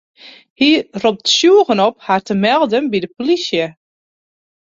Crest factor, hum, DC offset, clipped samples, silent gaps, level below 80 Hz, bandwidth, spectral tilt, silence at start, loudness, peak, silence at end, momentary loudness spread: 14 dB; none; under 0.1%; under 0.1%; 0.50-0.56 s; -60 dBFS; 7.8 kHz; -4 dB/octave; 0.25 s; -14 LUFS; -2 dBFS; 1 s; 9 LU